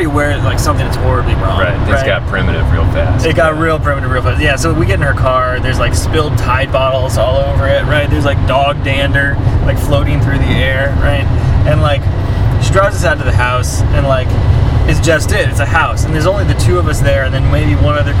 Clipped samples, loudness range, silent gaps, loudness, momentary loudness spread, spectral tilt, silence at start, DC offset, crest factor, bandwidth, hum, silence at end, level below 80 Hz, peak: under 0.1%; 1 LU; none; -12 LUFS; 2 LU; -6 dB/octave; 0 s; under 0.1%; 10 dB; 15.5 kHz; none; 0 s; -18 dBFS; 0 dBFS